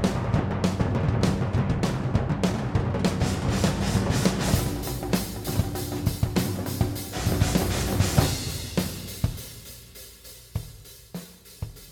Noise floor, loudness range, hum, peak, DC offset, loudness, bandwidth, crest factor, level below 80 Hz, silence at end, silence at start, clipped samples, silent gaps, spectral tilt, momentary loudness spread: -46 dBFS; 4 LU; none; -4 dBFS; under 0.1%; -26 LUFS; over 20 kHz; 22 dB; -36 dBFS; 0 s; 0 s; under 0.1%; none; -5.5 dB/octave; 17 LU